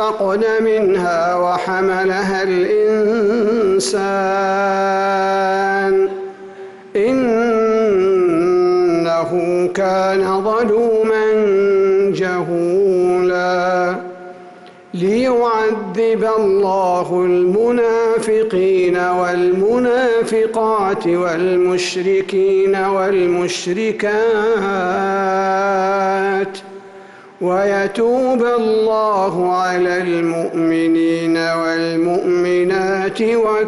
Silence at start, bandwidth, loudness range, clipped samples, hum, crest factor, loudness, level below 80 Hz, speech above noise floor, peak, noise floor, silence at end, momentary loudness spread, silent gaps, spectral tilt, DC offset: 0 s; 11.5 kHz; 2 LU; under 0.1%; none; 8 dB; -16 LUFS; -54 dBFS; 24 dB; -8 dBFS; -39 dBFS; 0 s; 4 LU; none; -5.5 dB/octave; under 0.1%